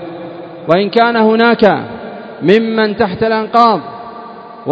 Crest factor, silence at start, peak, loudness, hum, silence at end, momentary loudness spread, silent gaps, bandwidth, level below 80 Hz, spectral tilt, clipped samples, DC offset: 14 dB; 0 s; 0 dBFS; -12 LUFS; none; 0 s; 19 LU; none; 7.2 kHz; -50 dBFS; -7.5 dB/octave; 0.3%; under 0.1%